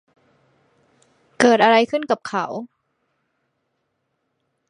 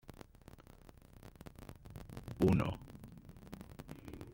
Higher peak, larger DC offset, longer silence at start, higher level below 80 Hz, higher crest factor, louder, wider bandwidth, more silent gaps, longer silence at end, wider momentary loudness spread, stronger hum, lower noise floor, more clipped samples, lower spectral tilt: first, 0 dBFS vs -18 dBFS; neither; first, 1.4 s vs 0.05 s; second, -72 dBFS vs -56 dBFS; about the same, 22 dB vs 24 dB; first, -18 LUFS vs -37 LUFS; second, 10.5 kHz vs 16.5 kHz; neither; first, 2.05 s vs 0 s; second, 14 LU vs 27 LU; neither; first, -73 dBFS vs -59 dBFS; neither; second, -4 dB/octave vs -8 dB/octave